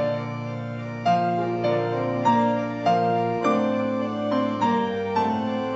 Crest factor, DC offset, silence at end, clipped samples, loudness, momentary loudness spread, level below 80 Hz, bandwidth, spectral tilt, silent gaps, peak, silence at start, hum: 14 dB; under 0.1%; 0 s; under 0.1%; -24 LUFS; 7 LU; -64 dBFS; 8 kHz; -7.5 dB/octave; none; -8 dBFS; 0 s; none